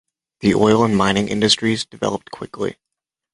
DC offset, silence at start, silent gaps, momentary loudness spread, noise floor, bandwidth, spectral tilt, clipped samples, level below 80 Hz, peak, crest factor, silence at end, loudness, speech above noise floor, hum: under 0.1%; 0.4 s; none; 12 LU; -83 dBFS; 11.5 kHz; -4.5 dB/octave; under 0.1%; -48 dBFS; 0 dBFS; 18 dB; 0.6 s; -18 LUFS; 65 dB; none